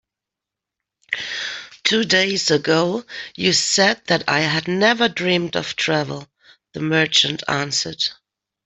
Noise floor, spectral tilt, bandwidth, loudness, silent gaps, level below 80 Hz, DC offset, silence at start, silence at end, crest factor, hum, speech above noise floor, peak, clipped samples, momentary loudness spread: -86 dBFS; -3 dB/octave; 8.4 kHz; -19 LUFS; none; -60 dBFS; under 0.1%; 1.1 s; 0.5 s; 18 dB; none; 66 dB; -2 dBFS; under 0.1%; 12 LU